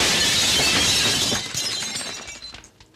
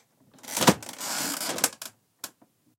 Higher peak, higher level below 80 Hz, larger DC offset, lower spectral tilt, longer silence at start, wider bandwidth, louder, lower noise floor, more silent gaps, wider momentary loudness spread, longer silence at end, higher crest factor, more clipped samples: second, -8 dBFS vs -2 dBFS; first, -46 dBFS vs -66 dBFS; neither; second, -1 dB/octave vs -2.5 dB/octave; second, 0 s vs 0.45 s; about the same, 16 kHz vs 17 kHz; first, -18 LUFS vs -26 LUFS; second, -43 dBFS vs -62 dBFS; neither; about the same, 18 LU vs 20 LU; second, 0.35 s vs 0.5 s; second, 14 dB vs 28 dB; neither